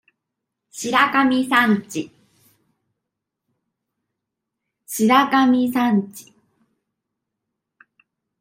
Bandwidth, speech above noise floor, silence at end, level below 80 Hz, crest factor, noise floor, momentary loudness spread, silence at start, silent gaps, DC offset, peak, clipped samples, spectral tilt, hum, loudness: 16 kHz; 64 dB; 2.2 s; -70 dBFS; 20 dB; -82 dBFS; 15 LU; 0.75 s; none; under 0.1%; -2 dBFS; under 0.1%; -4 dB/octave; none; -18 LUFS